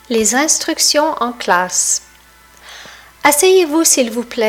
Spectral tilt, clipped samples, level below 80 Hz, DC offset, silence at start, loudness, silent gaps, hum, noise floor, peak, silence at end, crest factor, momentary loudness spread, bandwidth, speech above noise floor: -1 dB/octave; under 0.1%; -52 dBFS; under 0.1%; 0.1 s; -13 LUFS; none; 60 Hz at -50 dBFS; -45 dBFS; 0 dBFS; 0 s; 16 dB; 8 LU; 18.5 kHz; 31 dB